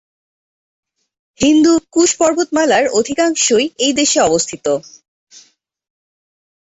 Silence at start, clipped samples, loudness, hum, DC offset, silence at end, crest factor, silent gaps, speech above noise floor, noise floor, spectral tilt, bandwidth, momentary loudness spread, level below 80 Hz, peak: 1.4 s; under 0.1%; -14 LUFS; none; under 0.1%; 1.85 s; 14 dB; none; 37 dB; -50 dBFS; -2.5 dB/octave; 8.2 kHz; 6 LU; -52 dBFS; -2 dBFS